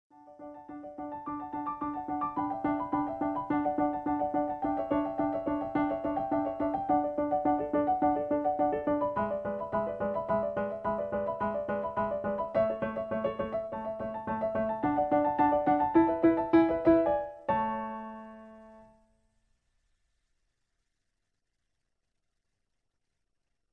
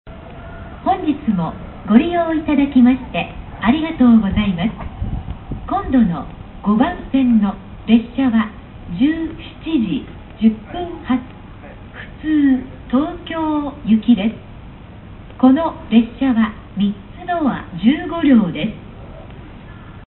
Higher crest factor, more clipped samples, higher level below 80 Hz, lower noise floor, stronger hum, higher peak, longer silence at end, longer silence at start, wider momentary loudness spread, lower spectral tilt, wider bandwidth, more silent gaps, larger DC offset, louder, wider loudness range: about the same, 20 dB vs 18 dB; neither; second, -58 dBFS vs -36 dBFS; first, -83 dBFS vs -36 dBFS; neither; second, -12 dBFS vs 0 dBFS; first, 4.9 s vs 0.05 s; first, 0.25 s vs 0.05 s; second, 12 LU vs 23 LU; second, -9.5 dB/octave vs -12 dB/octave; about the same, 4.3 kHz vs 4.2 kHz; neither; neither; second, -30 LUFS vs -17 LUFS; first, 7 LU vs 4 LU